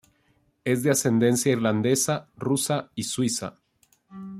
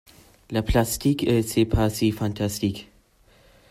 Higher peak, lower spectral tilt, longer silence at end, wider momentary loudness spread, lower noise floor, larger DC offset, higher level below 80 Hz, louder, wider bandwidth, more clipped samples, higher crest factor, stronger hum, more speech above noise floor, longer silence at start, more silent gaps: about the same, -8 dBFS vs -8 dBFS; about the same, -4.5 dB/octave vs -5.5 dB/octave; second, 0 s vs 0.9 s; first, 10 LU vs 7 LU; first, -66 dBFS vs -57 dBFS; neither; second, -64 dBFS vs -38 dBFS; about the same, -24 LUFS vs -24 LUFS; about the same, 16 kHz vs 16 kHz; neither; about the same, 18 dB vs 18 dB; neither; first, 42 dB vs 35 dB; first, 0.65 s vs 0.5 s; neither